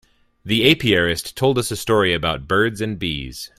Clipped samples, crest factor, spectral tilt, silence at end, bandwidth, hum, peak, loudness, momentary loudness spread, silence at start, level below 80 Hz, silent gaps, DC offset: under 0.1%; 20 dB; -4.5 dB/octave; 0.1 s; 15.5 kHz; none; 0 dBFS; -19 LUFS; 9 LU; 0.45 s; -44 dBFS; none; under 0.1%